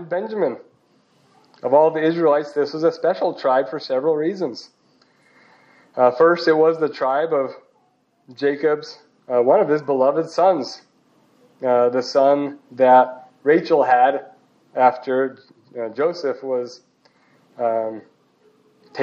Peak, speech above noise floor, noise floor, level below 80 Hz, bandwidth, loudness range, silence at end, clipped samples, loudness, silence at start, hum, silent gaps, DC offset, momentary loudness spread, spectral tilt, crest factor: -2 dBFS; 44 dB; -63 dBFS; -82 dBFS; 7.4 kHz; 6 LU; 0 s; under 0.1%; -19 LUFS; 0 s; none; none; under 0.1%; 14 LU; -6 dB/octave; 18 dB